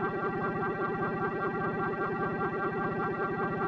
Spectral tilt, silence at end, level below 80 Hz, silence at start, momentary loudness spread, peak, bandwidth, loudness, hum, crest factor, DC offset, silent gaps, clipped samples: -9 dB/octave; 0 s; -58 dBFS; 0 s; 0 LU; -20 dBFS; 6.2 kHz; -32 LUFS; 60 Hz at -50 dBFS; 12 dB; under 0.1%; none; under 0.1%